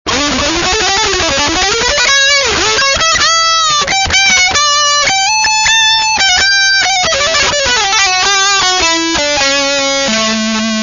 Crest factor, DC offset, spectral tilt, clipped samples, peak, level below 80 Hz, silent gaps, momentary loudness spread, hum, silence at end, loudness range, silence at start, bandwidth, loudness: 10 dB; under 0.1%; -0.5 dB/octave; under 0.1%; 0 dBFS; -34 dBFS; none; 4 LU; none; 0 s; 2 LU; 0.05 s; 7.6 kHz; -8 LUFS